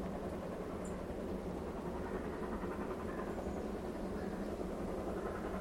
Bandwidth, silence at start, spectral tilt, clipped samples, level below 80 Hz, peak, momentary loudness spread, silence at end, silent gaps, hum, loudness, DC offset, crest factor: 16.5 kHz; 0 s; -7 dB/octave; under 0.1%; -52 dBFS; -28 dBFS; 2 LU; 0 s; none; none; -42 LUFS; under 0.1%; 14 dB